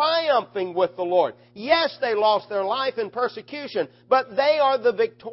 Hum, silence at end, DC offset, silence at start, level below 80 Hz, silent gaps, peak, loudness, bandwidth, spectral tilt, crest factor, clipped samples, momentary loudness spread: none; 0 s; under 0.1%; 0 s; -68 dBFS; none; -6 dBFS; -23 LUFS; 5.8 kHz; -7.5 dB/octave; 18 dB; under 0.1%; 9 LU